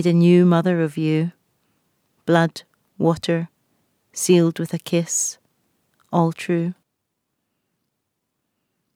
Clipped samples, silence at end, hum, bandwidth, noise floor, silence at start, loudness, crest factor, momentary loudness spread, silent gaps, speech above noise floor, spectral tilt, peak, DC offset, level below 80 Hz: under 0.1%; 2.2 s; none; 15 kHz; -77 dBFS; 0 s; -20 LUFS; 20 dB; 14 LU; none; 58 dB; -5.5 dB/octave; -2 dBFS; under 0.1%; -66 dBFS